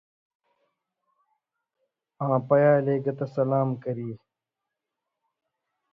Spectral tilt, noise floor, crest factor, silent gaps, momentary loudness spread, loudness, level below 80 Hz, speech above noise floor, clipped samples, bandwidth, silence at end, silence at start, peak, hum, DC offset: -11 dB/octave; -86 dBFS; 20 dB; none; 14 LU; -25 LUFS; -68 dBFS; 62 dB; under 0.1%; 5.2 kHz; 1.8 s; 2.2 s; -8 dBFS; none; under 0.1%